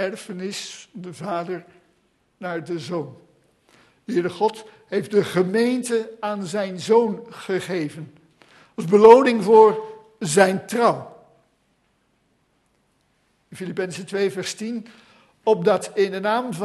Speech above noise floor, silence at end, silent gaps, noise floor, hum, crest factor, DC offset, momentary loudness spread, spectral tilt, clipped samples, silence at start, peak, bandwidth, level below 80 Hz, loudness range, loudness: 46 dB; 0 s; none; -66 dBFS; none; 22 dB; under 0.1%; 20 LU; -5 dB/octave; under 0.1%; 0 s; 0 dBFS; 12.5 kHz; -68 dBFS; 14 LU; -20 LUFS